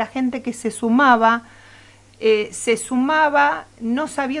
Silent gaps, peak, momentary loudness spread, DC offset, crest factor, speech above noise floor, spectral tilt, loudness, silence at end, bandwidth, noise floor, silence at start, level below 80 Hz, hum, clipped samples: none; -2 dBFS; 10 LU; under 0.1%; 16 dB; 29 dB; -3.5 dB/octave; -19 LUFS; 0 s; 11.5 kHz; -47 dBFS; 0 s; -58 dBFS; none; under 0.1%